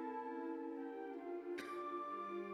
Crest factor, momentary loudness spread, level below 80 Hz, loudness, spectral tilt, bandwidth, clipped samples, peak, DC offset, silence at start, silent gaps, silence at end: 14 dB; 3 LU; -88 dBFS; -46 LUFS; -5.5 dB/octave; 12.5 kHz; under 0.1%; -32 dBFS; under 0.1%; 0 s; none; 0 s